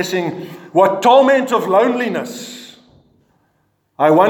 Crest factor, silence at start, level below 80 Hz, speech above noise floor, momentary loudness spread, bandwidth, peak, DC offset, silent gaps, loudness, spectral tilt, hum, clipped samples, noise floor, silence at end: 16 dB; 0 s; -70 dBFS; 49 dB; 19 LU; 18.5 kHz; 0 dBFS; under 0.1%; none; -14 LUFS; -5 dB/octave; none; under 0.1%; -63 dBFS; 0 s